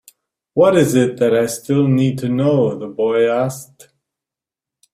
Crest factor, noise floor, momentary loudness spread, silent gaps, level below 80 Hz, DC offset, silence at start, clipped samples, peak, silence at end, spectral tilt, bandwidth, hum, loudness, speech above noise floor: 16 dB; -87 dBFS; 8 LU; none; -56 dBFS; under 0.1%; 0.55 s; under 0.1%; -2 dBFS; 1.3 s; -6.5 dB/octave; 15.5 kHz; none; -16 LUFS; 72 dB